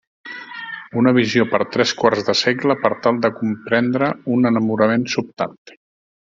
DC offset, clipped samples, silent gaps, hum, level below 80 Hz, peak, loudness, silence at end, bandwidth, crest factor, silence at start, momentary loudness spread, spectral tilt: under 0.1%; under 0.1%; none; none; -58 dBFS; 0 dBFS; -18 LUFS; 0.7 s; 7.6 kHz; 18 dB; 0.25 s; 13 LU; -5 dB/octave